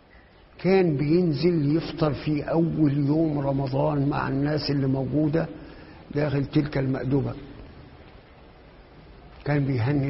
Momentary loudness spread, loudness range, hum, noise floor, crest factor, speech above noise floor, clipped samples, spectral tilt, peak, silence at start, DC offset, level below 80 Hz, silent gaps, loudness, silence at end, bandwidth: 12 LU; 6 LU; none; -52 dBFS; 16 dB; 29 dB; under 0.1%; -11 dB/octave; -8 dBFS; 0.6 s; under 0.1%; -48 dBFS; none; -24 LUFS; 0 s; 5.8 kHz